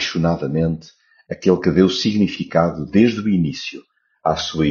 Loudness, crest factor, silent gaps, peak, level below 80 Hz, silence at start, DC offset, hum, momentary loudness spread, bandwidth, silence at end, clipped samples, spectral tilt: -18 LUFS; 18 dB; none; -2 dBFS; -44 dBFS; 0 s; under 0.1%; none; 9 LU; 7.2 kHz; 0 s; under 0.1%; -5.5 dB/octave